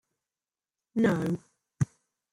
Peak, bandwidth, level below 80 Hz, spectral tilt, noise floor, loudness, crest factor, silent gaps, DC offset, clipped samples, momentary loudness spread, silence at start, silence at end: -14 dBFS; 14.5 kHz; -62 dBFS; -7.5 dB/octave; under -90 dBFS; -30 LUFS; 18 dB; none; under 0.1%; under 0.1%; 9 LU; 0.95 s; 0.45 s